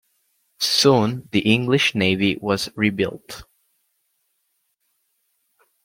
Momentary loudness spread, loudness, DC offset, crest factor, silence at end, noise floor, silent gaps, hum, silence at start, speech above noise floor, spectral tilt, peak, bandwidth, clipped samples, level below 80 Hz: 10 LU; -19 LUFS; under 0.1%; 20 dB; 2.4 s; -71 dBFS; none; none; 0.6 s; 52 dB; -4.5 dB/octave; -2 dBFS; 16.5 kHz; under 0.1%; -58 dBFS